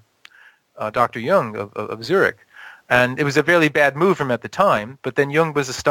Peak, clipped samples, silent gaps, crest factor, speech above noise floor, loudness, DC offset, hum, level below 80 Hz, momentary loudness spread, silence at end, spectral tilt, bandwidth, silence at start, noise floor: -2 dBFS; under 0.1%; none; 18 dB; 33 dB; -19 LUFS; under 0.1%; none; -56 dBFS; 10 LU; 0 s; -5 dB/octave; 17 kHz; 0.75 s; -52 dBFS